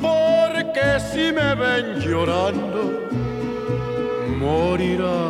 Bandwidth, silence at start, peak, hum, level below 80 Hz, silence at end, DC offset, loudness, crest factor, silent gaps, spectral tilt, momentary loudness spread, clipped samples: 14 kHz; 0 s; -6 dBFS; none; -42 dBFS; 0 s; under 0.1%; -21 LUFS; 14 dB; none; -6 dB/octave; 7 LU; under 0.1%